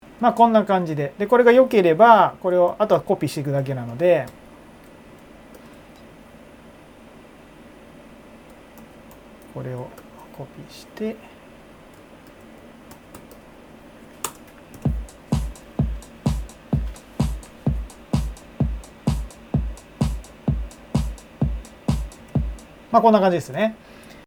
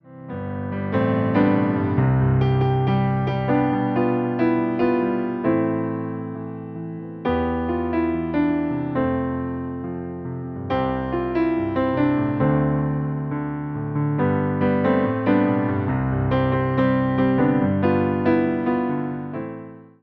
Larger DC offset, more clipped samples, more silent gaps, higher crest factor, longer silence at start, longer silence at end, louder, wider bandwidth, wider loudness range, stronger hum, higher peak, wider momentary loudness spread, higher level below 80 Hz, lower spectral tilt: neither; neither; neither; first, 22 dB vs 16 dB; first, 0.2 s vs 0.05 s; first, 0.5 s vs 0.2 s; about the same, -21 LUFS vs -22 LUFS; first, over 20 kHz vs 5.2 kHz; first, 22 LU vs 4 LU; neither; first, 0 dBFS vs -6 dBFS; first, 24 LU vs 11 LU; first, -36 dBFS vs -44 dBFS; second, -7 dB/octave vs -11 dB/octave